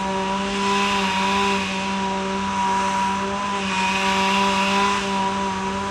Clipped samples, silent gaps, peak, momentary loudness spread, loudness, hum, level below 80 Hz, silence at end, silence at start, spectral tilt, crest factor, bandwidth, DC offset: under 0.1%; none; -8 dBFS; 5 LU; -21 LUFS; none; -48 dBFS; 0 s; 0 s; -3.5 dB/octave; 14 dB; 14.5 kHz; under 0.1%